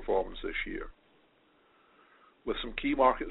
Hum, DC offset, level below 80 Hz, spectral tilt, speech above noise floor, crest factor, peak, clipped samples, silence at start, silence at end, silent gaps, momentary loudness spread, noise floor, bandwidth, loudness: none; under 0.1%; -48 dBFS; -2 dB/octave; 36 dB; 22 dB; -10 dBFS; under 0.1%; 0 s; 0 s; none; 16 LU; -66 dBFS; 4.2 kHz; -32 LUFS